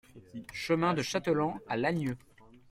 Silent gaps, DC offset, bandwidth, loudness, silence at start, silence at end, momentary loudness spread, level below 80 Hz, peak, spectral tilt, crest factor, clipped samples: none; under 0.1%; 16 kHz; -31 LUFS; 0.15 s; 0.55 s; 16 LU; -62 dBFS; -14 dBFS; -5.5 dB/octave; 18 dB; under 0.1%